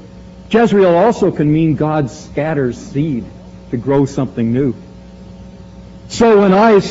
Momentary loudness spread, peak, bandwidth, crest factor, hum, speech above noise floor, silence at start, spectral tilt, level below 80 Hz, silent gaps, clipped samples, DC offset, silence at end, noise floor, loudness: 13 LU; -2 dBFS; 8 kHz; 12 dB; none; 23 dB; 0 s; -6.5 dB/octave; -40 dBFS; none; under 0.1%; under 0.1%; 0 s; -35 dBFS; -14 LUFS